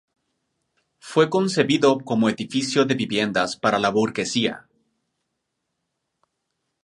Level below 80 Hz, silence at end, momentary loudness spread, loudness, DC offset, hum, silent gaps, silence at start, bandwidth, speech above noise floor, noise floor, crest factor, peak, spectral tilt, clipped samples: -64 dBFS; 2.25 s; 5 LU; -21 LUFS; under 0.1%; none; none; 1.05 s; 11.5 kHz; 57 dB; -78 dBFS; 22 dB; -2 dBFS; -4.5 dB/octave; under 0.1%